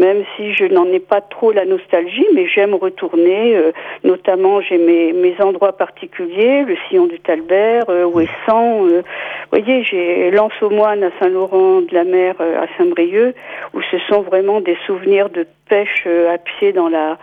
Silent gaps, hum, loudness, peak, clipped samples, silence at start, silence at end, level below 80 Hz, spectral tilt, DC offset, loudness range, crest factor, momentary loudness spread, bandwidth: none; none; -14 LUFS; -2 dBFS; under 0.1%; 0 s; 0.05 s; -62 dBFS; -7.5 dB/octave; under 0.1%; 2 LU; 12 dB; 6 LU; 3.8 kHz